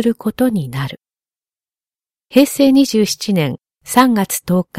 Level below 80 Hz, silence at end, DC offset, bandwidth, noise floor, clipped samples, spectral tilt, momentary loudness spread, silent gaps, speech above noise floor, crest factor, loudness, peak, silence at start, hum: -54 dBFS; 0 s; under 0.1%; 16.5 kHz; under -90 dBFS; under 0.1%; -5 dB/octave; 12 LU; none; over 76 dB; 16 dB; -15 LUFS; 0 dBFS; 0 s; none